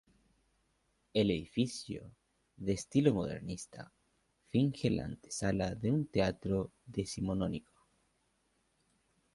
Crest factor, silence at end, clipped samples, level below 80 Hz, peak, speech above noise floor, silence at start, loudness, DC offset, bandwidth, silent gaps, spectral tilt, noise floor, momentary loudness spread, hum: 22 dB; 1.75 s; under 0.1%; -58 dBFS; -14 dBFS; 42 dB; 1.15 s; -35 LUFS; under 0.1%; 11.5 kHz; none; -6 dB/octave; -77 dBFS; 13 LU; none